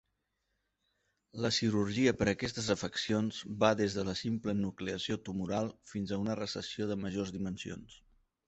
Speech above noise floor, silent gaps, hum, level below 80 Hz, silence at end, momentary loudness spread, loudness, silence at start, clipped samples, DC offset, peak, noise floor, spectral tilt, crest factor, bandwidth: 48 dB; none; none; -60 dBFS; 0.5 s; 10 LU; -34 LUFS; 1.35 s; under 0.1%; under 0.1%; -12 dBFS; -82 dBFS; -5 dB/octave; 24 dB; 8.2 kHz